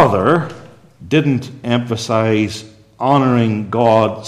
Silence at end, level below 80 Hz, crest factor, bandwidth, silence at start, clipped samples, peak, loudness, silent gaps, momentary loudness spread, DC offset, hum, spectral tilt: 0 s; -54 dBFS; 16 dB; 13 kHz; 0 s; under 0.1%; 0 dBFS; -16 LUFS; none; 8 LU; under 0.1%; none; -6.5 dB/octave